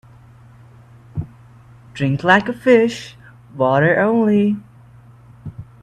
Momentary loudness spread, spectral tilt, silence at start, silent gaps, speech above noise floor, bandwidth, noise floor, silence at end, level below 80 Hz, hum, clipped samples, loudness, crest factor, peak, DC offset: 23 LU; -7 dB/octave; 1.15 s; none; 29 dB; 9.8 kHz; -44 dBFS; 0.2 s; -52 dBFS; none; under 0.1%; -16 LUFS; 20 dB; 0 dBFS; under 0.1%